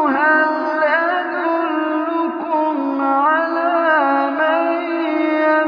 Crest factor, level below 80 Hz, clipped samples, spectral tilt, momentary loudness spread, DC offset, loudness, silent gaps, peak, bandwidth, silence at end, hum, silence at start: 14 dB; -80 dBFS; under 0.1%; -5.5 dB/octave; 5 LU; under 0.1%; -17 LUFS; none; -2 dBFS; 5.2 kHz; 0 s; none; 0 s